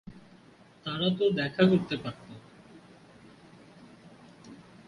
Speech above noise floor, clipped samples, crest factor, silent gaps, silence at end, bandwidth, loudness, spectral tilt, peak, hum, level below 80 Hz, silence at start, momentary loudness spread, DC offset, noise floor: 30 dB; under 0.1%; 22 dB; none; 0.3 s; 10.5 kHz; -28 LUFS; -7.5 dB/octave; -12 dBFS; none; -66 dBFS; 0.05 s; 27 LU; under 0.1%; -56 dBFS